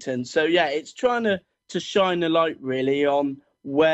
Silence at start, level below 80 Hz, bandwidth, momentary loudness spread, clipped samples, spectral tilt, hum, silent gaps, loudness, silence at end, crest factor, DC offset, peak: 0 s; -64 dBFS; 8.4 kHz; 9 LU; under 0.1%; -5 dB/octave; none; none; -23 LUFS; 0 s; 14 dB; under 0.1%; -8 dBFS